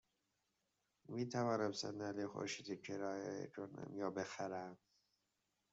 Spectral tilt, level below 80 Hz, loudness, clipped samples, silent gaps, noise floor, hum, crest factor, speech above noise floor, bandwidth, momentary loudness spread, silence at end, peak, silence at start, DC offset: -4.5 dB/octave; -86 dBFS; -45 LUFS; under 0.1%; none; -87 dBFS; none; 20 dB; 42 dB; 7.6 kHz; 10 LU; 0.95 s; -26 dBFS; 1.1 s; under 0.1%